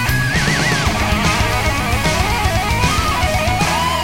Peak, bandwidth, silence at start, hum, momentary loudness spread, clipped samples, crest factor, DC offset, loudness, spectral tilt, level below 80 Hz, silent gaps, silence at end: -2 dBFS; 17 kHz; 0 s; none; 2 LU; under 0.1%; 14 dB; 2%; -16 LUFS; -4 dB/octave; -24 dBFS; none; 0 s